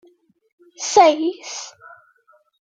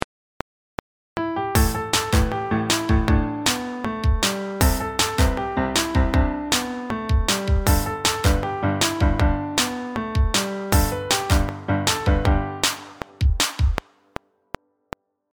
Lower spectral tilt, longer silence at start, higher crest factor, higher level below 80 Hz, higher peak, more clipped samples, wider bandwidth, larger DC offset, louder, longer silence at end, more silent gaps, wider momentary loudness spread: second, -1.5 dB/octave vs -4 dB/octave; second, 0.8 s vs 1.15 s; about the same, 20 dB vs 22 dB; second, -72 dBFS vs -26 dBFS; about the same, -2 dBFS vs 0 dBFS; neither; second, 9.4 kHz vs over 20 kHz; neither; first, -17 LUFS vs -22 LUFS; second, 1.05 s vs 1.55 s; neither; about the same, 18 LU vs 19 LU